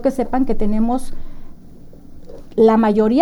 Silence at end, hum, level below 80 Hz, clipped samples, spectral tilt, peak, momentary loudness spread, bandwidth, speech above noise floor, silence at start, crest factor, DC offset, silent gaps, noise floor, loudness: 0 s; none; -28 dBFS; under 0.1%; -7.5 dB/octave; 0 dBFS; 12 LU; 11.5 kHz; 22 dB; 0 s; 16 dB; under 0.1%; none; -37 dBFS; -17 LUFS